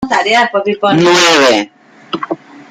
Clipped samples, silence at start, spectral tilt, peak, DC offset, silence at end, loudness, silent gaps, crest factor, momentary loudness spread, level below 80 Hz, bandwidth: under 0.1%; 0 s; -3.5 dB/octave; 0 dBFS; under 0.1%; 0.1 s; -10 LUFS; none; 12 dB; 17 LU; -52 dBFS; 16 kHz